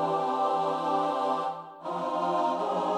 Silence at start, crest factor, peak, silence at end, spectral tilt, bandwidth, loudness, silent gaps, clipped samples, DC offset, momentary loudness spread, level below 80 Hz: 0 s; 12 dB; -16 dBFS; 0 s; -5.5 dB/octave; 11.5 kHz; -29 LUFS; none; under 0.1%; under 0.1%; 7 LU; -80 dBFS